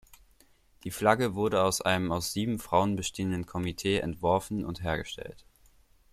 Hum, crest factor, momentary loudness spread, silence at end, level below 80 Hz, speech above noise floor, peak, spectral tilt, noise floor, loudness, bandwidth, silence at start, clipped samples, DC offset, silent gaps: none; 22 dB; 10 LU; 0.75 s; -54 dBFS; 33 dB; -8 dBFS; -4.5 dB/octave; -62 dBFS; -29 LUFS; 16 kHz; 0.1 s; under 0.1%; under 0.1%; none